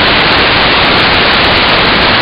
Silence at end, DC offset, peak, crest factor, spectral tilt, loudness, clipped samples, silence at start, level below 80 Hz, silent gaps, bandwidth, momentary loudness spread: 0 s; under 0.1%; 0 dBFS; 8 dB; -5.5 dB/octave; -6 LUFS; 0.3%; 0 s; -26 dBFS; none; 17 kHz; 0 LU